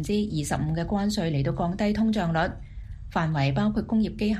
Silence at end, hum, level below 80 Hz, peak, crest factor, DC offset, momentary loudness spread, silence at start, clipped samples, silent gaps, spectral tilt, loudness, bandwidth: 0 s; none; -40 dBFS; -10 dBFS; 14 dB; under 0.1%; 6 LU; 0 s; under 0.1%; none; -6.5 dB/octave; -26 LUFS; 13 kHz